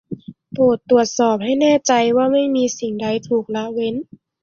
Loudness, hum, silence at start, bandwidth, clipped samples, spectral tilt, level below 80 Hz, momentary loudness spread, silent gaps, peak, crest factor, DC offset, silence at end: -17 LUFS; none; 0.1 s; 7.4 kHz; under 0.1%; -4.5 dB/octave; -60 dBFS; 10 LU; none; -2 dBFS; 16 dB; under 0.1%; 0.4 s